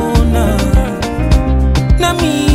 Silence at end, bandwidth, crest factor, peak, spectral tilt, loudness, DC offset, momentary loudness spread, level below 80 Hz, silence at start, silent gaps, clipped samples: 0 s; 15.5 kHz; 10 dB; 0 dBFS; -6 dB/octave; -13 LUFS; under 0.1%; 2 LU; -14 dBFS; 0 s; none; under 0.1%